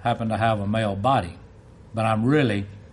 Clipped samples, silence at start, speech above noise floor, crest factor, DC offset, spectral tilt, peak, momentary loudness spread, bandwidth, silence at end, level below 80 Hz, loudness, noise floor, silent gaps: under 0.1%; 0 s; 24 dB; 16 dB; under 0.1%; -7.5 dB/octave; -8 dBFS; 9 LU; 11.5 kHz; 0.05 s; -50 dBFS; -23 LUFS; -47 dBFS; none